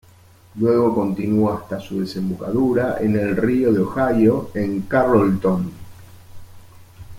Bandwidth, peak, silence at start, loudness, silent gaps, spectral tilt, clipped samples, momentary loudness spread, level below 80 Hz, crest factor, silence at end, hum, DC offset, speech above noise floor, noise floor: 16.5 kHz; -4 dBFS; 0.55 s; -19 LUFS; none; -8.5 dB/octave; under 0.1%; 9 LU; -48 dBFS; 16 dB; 0 s; none; under 0.1%; 30 dB; -49 dBFS